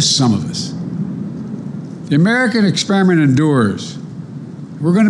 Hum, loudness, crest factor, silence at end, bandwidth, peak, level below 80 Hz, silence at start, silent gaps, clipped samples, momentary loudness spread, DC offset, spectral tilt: none; -15 LUFS; 12 dB; 0 s; 11.5 kHz; -4 dBFS; -56 dBFS; 0 s; none; under 0.1%; 17 LU; under 0.1%; -5 dB/octave